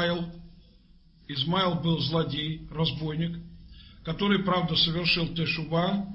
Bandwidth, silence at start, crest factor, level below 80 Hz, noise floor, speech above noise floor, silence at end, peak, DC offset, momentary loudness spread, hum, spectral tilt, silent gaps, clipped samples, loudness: 6 kHz; 0 s; 18 dB; -50 dBFS; -56 dBFS; 29 dB; 0 s; -12 dBFS; under 0.1%; 11 LU; none; -8 dB/octave; none; under 0.1%; -27 LUFS